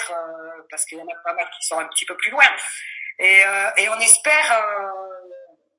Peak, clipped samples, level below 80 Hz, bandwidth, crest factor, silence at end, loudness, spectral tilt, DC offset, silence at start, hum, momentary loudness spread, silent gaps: 0 dBFS; under 0.1%; -76 dBFS; 12 kHz; 20 dB; 0.35 s; -16 LUFS; 2.5 dB/octave; under 0.1%; 0 s; none; 19 LU; none